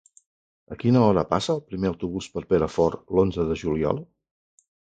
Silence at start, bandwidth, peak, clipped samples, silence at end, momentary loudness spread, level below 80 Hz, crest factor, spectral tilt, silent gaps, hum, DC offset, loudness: 0.7 s; 9.2 kHz; -4 dBFS; under 0.1%; 0.9 s; 11 LU; -46 dBFS; 20 dB; -7 dB/octave; none; none; under 0.1%; -24 LUFS